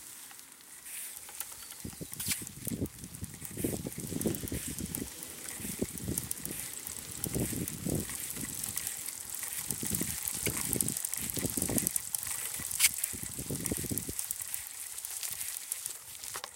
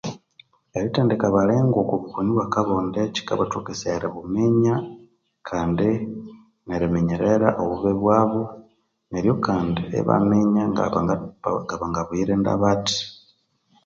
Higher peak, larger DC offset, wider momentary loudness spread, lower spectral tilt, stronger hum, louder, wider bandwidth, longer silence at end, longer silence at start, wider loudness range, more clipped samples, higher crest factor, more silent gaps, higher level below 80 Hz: about the same, -4 dBFS vs -2 dBFS; neither; about the same, 11 LU vs 9 LU; second, -2.5 dB/octave vs -6.5 dB/octave; neither; second, -34 LUFS vs -22 LUFS; first, 17 kHz vs 7.6 kHz; second, 0 s vs 0.7 s; about the same, 0 s vs 0.05 s; first, 6 LU vs 2 LU; neither; first, 32 dB vs 22 dB; neither; second, -54 dBFS vs -48 dBFS